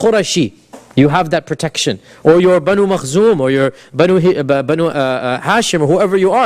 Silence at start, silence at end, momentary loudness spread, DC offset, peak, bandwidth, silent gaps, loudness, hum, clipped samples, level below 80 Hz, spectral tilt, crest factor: 0 s; 0 s; 6 LU; under 0.1%; 0 dBFS; 15 kHz; none; -13 LUFS; none; under 0.1%; -48 dBFS; -5 dB/octave; 12 dB